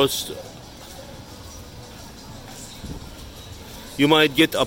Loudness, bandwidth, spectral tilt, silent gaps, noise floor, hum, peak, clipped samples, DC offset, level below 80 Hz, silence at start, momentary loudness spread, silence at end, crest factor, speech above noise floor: -19 LUFS; 17 kHz; -4 dB/octave; none; -40 dBFS; none; -4 dBFS; under 0.1%; under 0.1%; -46 dBFS; 0 s; 23 LU; 0 s; 22 dB; 21 dB